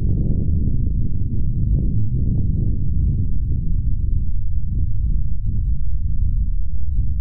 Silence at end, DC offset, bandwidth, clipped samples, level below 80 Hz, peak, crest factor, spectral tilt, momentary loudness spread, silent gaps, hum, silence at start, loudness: 0 s; 9%; 0.8 kHz; under 0.1%; -20 dBFS; -6 dBFS; 10 dB; -17 dB/octave; 4 LU; none; none; 0 s; -23 LUFS